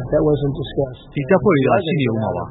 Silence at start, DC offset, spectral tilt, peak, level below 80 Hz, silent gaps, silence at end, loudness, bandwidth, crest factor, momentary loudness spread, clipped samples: 0 s; under 0.1%; -12.5 dB/octave; -2 dBFS; -40 dBFS; none; 0 s; -18 LUFS; 4.1 kHz; 16 dB; 9 LU; under 0.1%